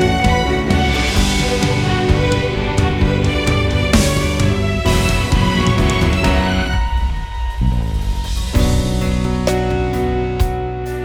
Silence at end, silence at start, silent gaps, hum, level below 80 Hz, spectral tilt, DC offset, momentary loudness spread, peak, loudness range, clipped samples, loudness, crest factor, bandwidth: 0 s; 0 s; none; none; -20 dBFS; -5.5 dB/octave; under 0.1%; 6 LU; 0 dBFS; 3 LU; under 0.1%; -16 LUFS; 14 dB; 17 kHz